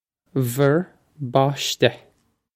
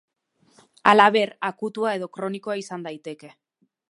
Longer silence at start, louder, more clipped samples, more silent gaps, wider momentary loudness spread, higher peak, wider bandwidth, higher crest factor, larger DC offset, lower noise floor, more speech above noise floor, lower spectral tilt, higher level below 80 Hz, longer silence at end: second, 0.35 s vs 0.85 s; about the same, -21 LUFS vs -21 LUFS; neither; neither; second, 11 LU vs 20 LU; about the same, -2 dBFS vs 0 dBFS; first, 16 kHz vs 11.5 kHz; about the same, 22 dB vs 24 dB; neither; about the same, -63 dBFS vs -63 dBFS; about the same, 42 dB vs 41 dB; about the same, -5 dB/octave vs -4.5 dB/octave; first, -64 dBFS vs -72 dBFS; about the same, 0.6 s vs 0.65 s